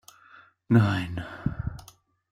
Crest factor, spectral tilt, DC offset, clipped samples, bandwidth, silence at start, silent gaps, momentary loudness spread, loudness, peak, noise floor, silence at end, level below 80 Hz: 20 dB; -7.5 dB/octave; under 0.1%; under 0.1%; 15.5 kHz; 0.7 s; none; 15 LU; -27 LUFS; -8 dBFS; -55 dBFS; 0.5 s; -48 dBFS